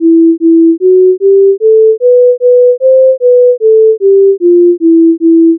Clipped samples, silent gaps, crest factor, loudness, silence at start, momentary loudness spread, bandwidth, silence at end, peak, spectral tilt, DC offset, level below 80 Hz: under 0.1%; none; 4 dB; -6 LUFS; 0 s; 0 LU; 0.6 kHz; 0 s; 0 dBFS; -15 dB/octave; under 0.1%; -84 dBFS